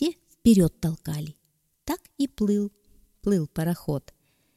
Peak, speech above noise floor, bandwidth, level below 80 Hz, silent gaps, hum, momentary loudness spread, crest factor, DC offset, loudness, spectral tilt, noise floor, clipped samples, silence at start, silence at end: -8 dBFS; 28 dB; 15.5 kHz; -48 dBFS; none; none; 14 LU; 20 dB; under 0.1%; -26 LUFS; -7 dB/octave; -51 dBFS; under 0.1%; 0 s; 0.55 s